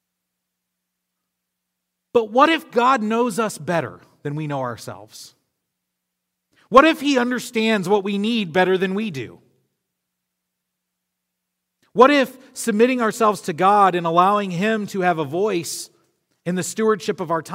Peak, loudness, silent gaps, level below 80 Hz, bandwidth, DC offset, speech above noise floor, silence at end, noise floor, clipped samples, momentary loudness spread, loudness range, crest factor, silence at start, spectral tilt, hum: 0 dBFS; -19 LUFS; none; -62 dBFS; 16 kHz; under 0.1%; 61 dB; 0 s; -79 dBFS; under 0.1%; 14 LU; 8 LU; 22 dB; 2.15 s; -5 dB/octave; 60 Hz at -50 dBFS